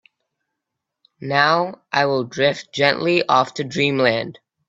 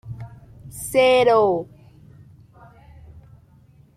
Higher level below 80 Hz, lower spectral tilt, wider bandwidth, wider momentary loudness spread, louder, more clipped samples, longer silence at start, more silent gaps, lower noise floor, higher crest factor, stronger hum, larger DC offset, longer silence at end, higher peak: second, -62 dBFS vs -54 dBFS; about the same, -5 dB/octave vs -4.5 dB/octave; second, 8 kHz vs 15.5 kHz; second, 7 LU vs 25 LU; about the same, -19 LUFS vs -18 LUFS; neither; first, 1.2 s vs 0.05 s; neither; first, -81 dBFS vs -52 dBFS; about the same, 20 dB vs 18 dB; neither; neither; second, 0.35 s vs 2.3 s; first, 0 dBFS vs -6 dBFS